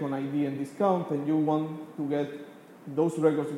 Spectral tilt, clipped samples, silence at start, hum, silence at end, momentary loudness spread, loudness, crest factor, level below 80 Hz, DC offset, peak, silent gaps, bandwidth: -8 dB/octave; under 0.1%; 0 s; none; 0 s; 11 LU; -29 LUFS; 18 dB; -82 dBFS; under 0.1%; -10 dBFS; none; 12.5 kHz